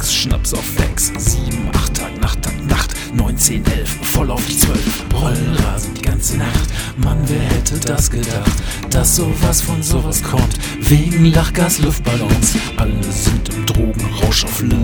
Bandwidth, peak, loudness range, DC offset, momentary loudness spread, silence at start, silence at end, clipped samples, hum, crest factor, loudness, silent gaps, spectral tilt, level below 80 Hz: over 20 kHz; 0 dBFS; 3 LU; under 0.1%; 6 LU; 0 s; 0 s; under 0.1%; none; 16 dB; -16 LUFS; none; -4 dB/octave; -20 dBFS